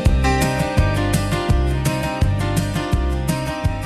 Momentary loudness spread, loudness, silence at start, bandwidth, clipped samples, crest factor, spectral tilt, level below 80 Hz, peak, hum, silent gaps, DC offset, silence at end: 4 LU; -20 LUFS; 0 s; 14.5 kHz; under 0.1%; 14 dB; -6 dB/octave; -24 dBFS; -4 dBFS; none; none; under 0.1%; 0 s